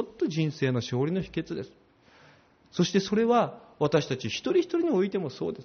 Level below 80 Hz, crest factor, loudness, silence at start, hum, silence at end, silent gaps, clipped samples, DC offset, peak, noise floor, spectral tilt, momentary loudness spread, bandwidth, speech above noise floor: -62 dBFS; 16 dB; -28 LUFS; 0 s; none; 0 s; none; under 0.1%; under 0.1%; -12 dBFS; -58 dBFS; -5.5 dB/octave; 9 LU; 6.6 kHz; 31 dB